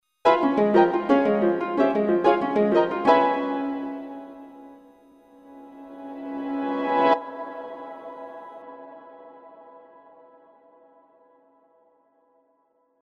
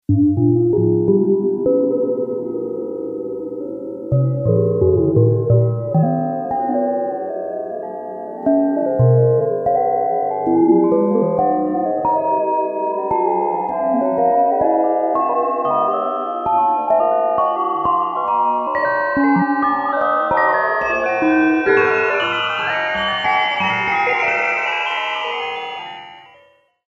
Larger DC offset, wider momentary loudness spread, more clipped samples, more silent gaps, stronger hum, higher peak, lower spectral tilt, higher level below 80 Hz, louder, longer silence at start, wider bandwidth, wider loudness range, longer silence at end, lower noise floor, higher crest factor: neither; first, 23 LU vs 10 LU; neither; neither; neither; about the same, -4 dBFS vs -2 dBFS; about the same, -7.5 dB/octave vs -8 dB/octave; second, -66 dBFS vs -50 dBFS; second, -22 LUFS vs -17 LUFS; first, 0.25 s vs 0.1 s; about the same, 7.6 kHz vs 7.6 kHz; first, 21 LU vs 4 LU; first, 3.3 s vs 0.7 s; first, -67 dBFS vs -53 dBFS; first, 20 dB vs 14 dB